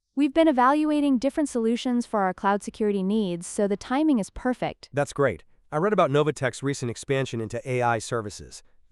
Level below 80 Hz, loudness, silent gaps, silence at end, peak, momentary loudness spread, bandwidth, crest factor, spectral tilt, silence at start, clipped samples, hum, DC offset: -54 dBFS; -25 LUFS; none; 0.3 s; -8 dBFS; 10 LU; 12 kHz; 18 dB; -6 dB/octave; 0.15 s; under 0.1%; none; under 0.1%